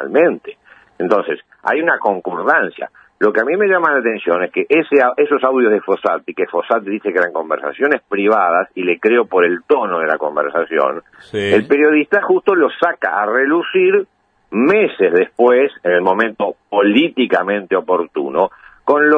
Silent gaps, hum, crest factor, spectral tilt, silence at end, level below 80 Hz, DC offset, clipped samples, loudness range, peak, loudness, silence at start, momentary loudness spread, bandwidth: none; none; 14 dB; -7 dB/octave; 0 s; -66 dBFS; under 0.1%; under 0.1%; 2 LU; 0 dBFS; -15 LUFS; 0 s; 7 LU; 8 kHz